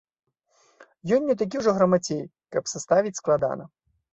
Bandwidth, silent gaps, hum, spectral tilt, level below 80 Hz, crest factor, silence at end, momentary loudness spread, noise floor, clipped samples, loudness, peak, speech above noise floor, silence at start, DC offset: 8.2 kHz; none; none; -5.5 dB/octave; -64 dBFS; 18 dB; 0.45 s; 10 LU; -65 dBFS; under 0.1%; -24 LUFS; -6 dBFS; 41 dB; 0.8 s; under 0.1%